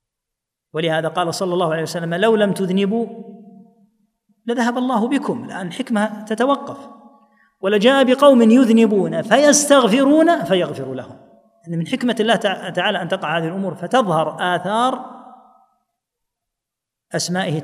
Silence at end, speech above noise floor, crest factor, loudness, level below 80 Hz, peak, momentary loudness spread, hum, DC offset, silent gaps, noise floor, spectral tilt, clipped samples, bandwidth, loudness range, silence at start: 0 s; 67 dB; 18 dB; -17 LUFS; -74 dBFS; 0 dBFS; 16 LU; none; under 0.1%; none; -84 dBFS; -4.5 dB/octave; under 0.1%; 15.5 kHz; 9 LU; 0.75 s